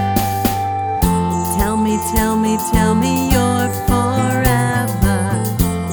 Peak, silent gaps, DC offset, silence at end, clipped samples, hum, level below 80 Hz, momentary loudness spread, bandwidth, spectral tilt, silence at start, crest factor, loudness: 0 dBFS; none; under 0.1%; 0 s; under 0.1%; none; -26 dBFS; 3 LU; over 20 kHz; -5.5 dB/octave; 0 s; 16 dB; -16 LUFS